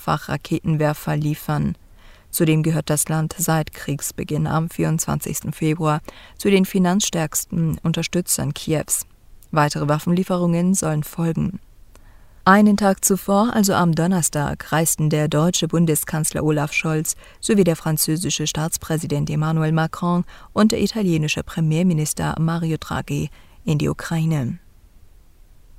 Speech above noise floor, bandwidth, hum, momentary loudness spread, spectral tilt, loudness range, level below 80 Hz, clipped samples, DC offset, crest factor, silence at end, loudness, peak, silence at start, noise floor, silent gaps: 28 dB; 16 kHz; none; 8 LU; -5 dB/octave; 4 LU; -46 dBFS; under 0.1%; under 0.1%; 20 dB; 0.8 s; -20 LUFS; 0 dBFS; 0 s; -47 dBFS; none